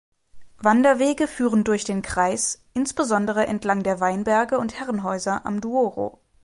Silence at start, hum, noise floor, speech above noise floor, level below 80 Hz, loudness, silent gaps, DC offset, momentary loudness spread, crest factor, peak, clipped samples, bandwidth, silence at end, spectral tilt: 0.35 s; none; -42 dBFS; 21 dB; -52 dBFS; -22 LUFS; none; under 0.1%; 8 LU; 18 dB; -4 dBFS; under 0.1%; 11.5 kHz; 0.35 s; -4.5 dB/octave